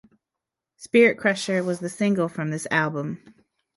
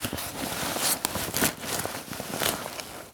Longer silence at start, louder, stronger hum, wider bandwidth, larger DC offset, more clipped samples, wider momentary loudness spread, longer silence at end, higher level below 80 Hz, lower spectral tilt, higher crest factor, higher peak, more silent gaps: first, 0.8 s vs 0 s; first, -23 LUFS vs -28 LUFS; neither; second, 11.5 kHz vs over 20 kHz; neither; neither; first, 12 LU vs 9 LU; first, 0.45 s vs 0 s; second, -68 dBFS vs -54 dBFS; first, -5.5 dB/octave vs -2 dB/octave; second, 20 dB vs 26 dB; about the same, -6 dBFS vs -4 dBFS; neither